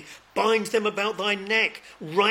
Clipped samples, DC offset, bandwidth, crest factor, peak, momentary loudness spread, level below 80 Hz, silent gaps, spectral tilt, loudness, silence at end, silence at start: under 0.1%; under 0.1%; 16.5 kHz; 18 dB; -8 dBFS; 7 LU; -70 dBFS; none; -3.5 dB/octave; -24 LUFS; 0 s; 0 s